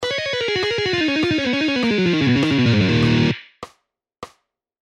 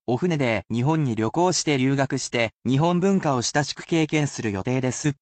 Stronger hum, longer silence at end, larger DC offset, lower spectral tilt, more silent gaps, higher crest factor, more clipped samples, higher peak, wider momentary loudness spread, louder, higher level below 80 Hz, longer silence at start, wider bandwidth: neither; first, 0.55 s vs 0.1 s; neither; about the same, -6 dB/octave vs -5 dB/octave; second, none vs 2.53-2.60 s; about the same, 14 dB vs 14 dB; neither; first, -4 dBFS vs -8 dBFS; about the same, 5 LU vs 4 LU; first, -18 LUFS vs -23 LUFS; first, -46 dBFS vs -58 dBFS; about the same, 0 s vs 0.1 s; first, 10.5 kHz vs 9 kHz